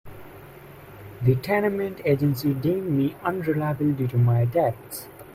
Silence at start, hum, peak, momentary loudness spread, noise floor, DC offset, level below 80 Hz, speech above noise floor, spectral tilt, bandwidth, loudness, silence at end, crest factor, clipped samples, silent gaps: 0.05 s; none; -6 dBFS; 23 LU; -44 dBFS; under 0.1%; -54 dBFS; 21 dB; -8 dB/octave; 16 kHz; -24 LUFS; 0 s; 18 dB; under 0.1%; none